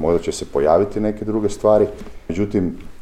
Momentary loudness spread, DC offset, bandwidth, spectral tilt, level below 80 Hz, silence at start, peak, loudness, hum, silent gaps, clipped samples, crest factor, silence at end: 9 LU; under 0.1%; 13 kHz; -6.5 dB/octave; -38 dBFS; 0 s; -2 dBFS; -19 LUFS; none; none; under 0.1%; 16 dB; 0 s